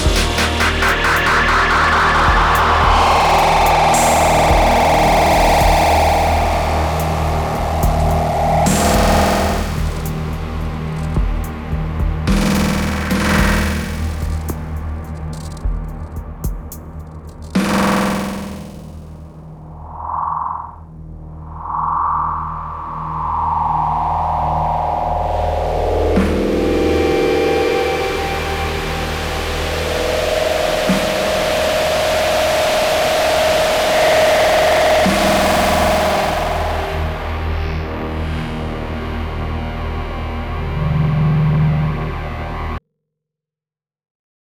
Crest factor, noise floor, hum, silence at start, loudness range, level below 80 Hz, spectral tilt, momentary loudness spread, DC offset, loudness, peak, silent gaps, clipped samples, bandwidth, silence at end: 16 dB; under -90 dBFS; none; 0 s; 10 LU; -24 dBFS; -5 dB/octave; 14 LU; under 0.1%; -16 LUFS; -2 dBFS; none; under 0.1%; over 20 kHz; 1.65 s